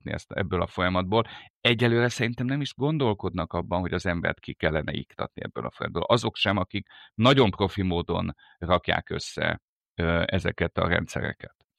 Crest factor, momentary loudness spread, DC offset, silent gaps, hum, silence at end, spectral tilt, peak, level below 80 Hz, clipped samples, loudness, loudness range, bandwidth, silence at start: 22 dB; 12 LU; under 0.1%; 1.50-1.61 s, 9.62-9.81 s, 9.90-9.95 s; none; 0.3 s; -6 dB/octave; -6 dBFS; -48 dBFS; under 0.1%; -26 LUFS; 3 LU; 13 kHz; 0.05 s